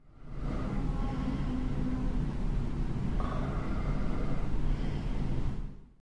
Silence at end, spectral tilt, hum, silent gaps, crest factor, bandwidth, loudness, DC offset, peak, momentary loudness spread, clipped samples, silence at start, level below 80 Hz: 0.15 s; -8 dB/octave; none; none; 14 dB; 8 kHz; -35 LUFS; under 0.1%; -18 dBFS; 4 LU; under 0.1%; 0.05 s; -34 dBFS